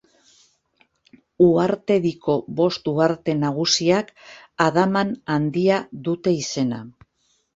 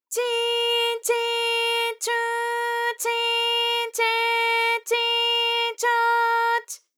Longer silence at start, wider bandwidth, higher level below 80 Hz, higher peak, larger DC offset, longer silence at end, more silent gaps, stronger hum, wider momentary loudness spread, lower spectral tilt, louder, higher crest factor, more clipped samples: first, 1.4 s vs 0.1 s; second, 8 kHz vs over 20 kHz; first, -58 dBFS vs under -90 dBFS; first, -2 dBFS vs -10 dBFS; neither; first, 0.65 s vs 0.2 s; neither; neither; about the same, 7 LU vs 5 LU; first, -5 dB/octave vs 5.5 dB/octave; about the same, -21 LUFS vs -22 LUFS; first, 20 dB vs 12 dB; neither